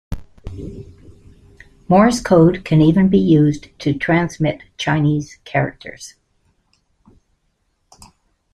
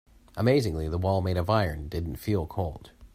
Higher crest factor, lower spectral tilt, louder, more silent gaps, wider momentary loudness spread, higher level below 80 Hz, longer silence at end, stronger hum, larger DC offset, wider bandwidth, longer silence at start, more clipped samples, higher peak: about the same, 16 dB vs 20 dB; about the same, -7 dB/octave vs -7.5 dB/octave; first, -16 LUFS vs -28 LUFS; neither; first, 21 LU vs 10 LU; about the same, -42 dBFS vs -44 dBFS; first, 2.45 s vs 0.1 s; neither; neither; second, 12 kHz vs 16 kHz; second, 0.1 s vs 0.35 s; neither; first, -2 dBFS vs -8 dBFS